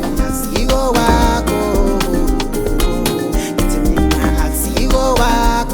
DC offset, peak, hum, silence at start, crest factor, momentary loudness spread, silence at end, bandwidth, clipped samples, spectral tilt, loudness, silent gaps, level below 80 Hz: under 0.1%; 0 dBFS; none; 0 s; 14 dB; 5 LU; 0 s; over 20 kHz; under 0.1%; -5 dB/octave; -16 LUFS; none; -18 dBFS